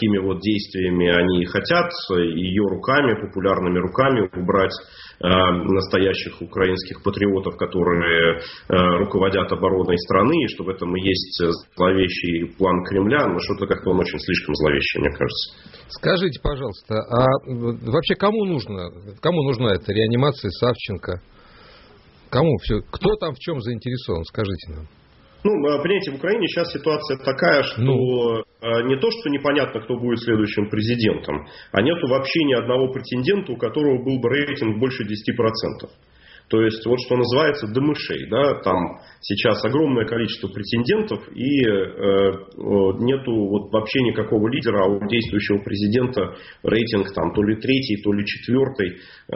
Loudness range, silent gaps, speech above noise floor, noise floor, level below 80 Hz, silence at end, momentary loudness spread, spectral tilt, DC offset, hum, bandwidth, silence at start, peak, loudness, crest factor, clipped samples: 3 LU; none; 29 dB; -49 dBFS; -44 dBFS; 0 s; 8 LU; -4.5 dB/octave; under 0.1%; none; 6 kHz; 0 s; -2 dBFS; -21 LUFS; 18 dB; under 0.1%